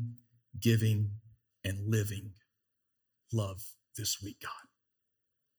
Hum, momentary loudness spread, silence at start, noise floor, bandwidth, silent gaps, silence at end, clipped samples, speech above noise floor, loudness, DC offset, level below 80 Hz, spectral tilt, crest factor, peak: none; 20 LU; 0 s; -78 dBFS; over 20 kHz; none; 0.95 s; under 0.1%; 46 dB; -35 LUFS; under 0.1%; -72 dBFS; -5 dB/octave; 22 dB; -14 dBFS